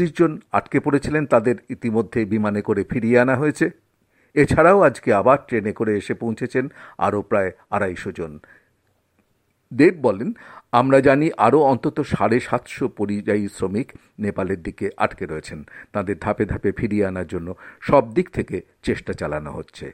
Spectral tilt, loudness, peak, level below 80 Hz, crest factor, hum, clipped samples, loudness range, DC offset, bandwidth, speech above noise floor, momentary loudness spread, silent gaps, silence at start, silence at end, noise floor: -7.5 dB/octave; -20 LUFS; -2 dBFS; -46 dBFS; 20 dB; none; under 0.1%; 7 LU; under 0.1%; 12 kHz; 46 dB; 14 LU; none; 0 s; 0 s; -67 dBFS